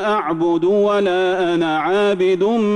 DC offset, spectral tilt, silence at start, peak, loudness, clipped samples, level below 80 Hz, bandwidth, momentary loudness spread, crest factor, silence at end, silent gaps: under 0.1%; -6 dB/octave; 0 s; -8 dBFS; -17 LUFS; under 0.1%; -58 dBFS; 9.8 kHz; 2 LU; 8 dB; 0 s; none